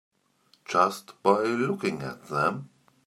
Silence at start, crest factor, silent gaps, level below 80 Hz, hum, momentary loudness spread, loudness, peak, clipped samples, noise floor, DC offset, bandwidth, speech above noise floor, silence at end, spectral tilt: 0.7 s; 22 dB; none; -68 dBFS; none; 11 LU; -27 LUFS; -6 dBFS; under 0.1%; -65 dBFS; under 0.1%; 15 kHz; 39 dB; 0.4 s; -5.5 dB/octave